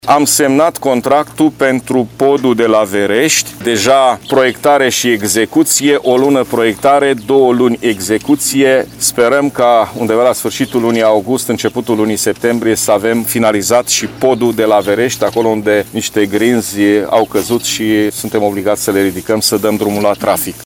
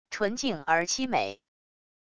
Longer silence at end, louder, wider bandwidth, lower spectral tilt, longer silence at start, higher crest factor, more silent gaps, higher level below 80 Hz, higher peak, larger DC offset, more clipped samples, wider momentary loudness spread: second, 0 s vs 0.65 s; first, -12 LUFS vs -28 LUFS; first, 19 kHz vs 11 kHz; about the same, -3.5 dB/octave vs -2.5 dB/octave; about the same, 0.05 s vs 0.05 s; second, 12 dB vs 20 dB; neither; first, -48 dBFS vs -62 dBFS; first, 0 dBFS vs -10 dBFS; neither; neither; about the same, 4 LU vs 5 LU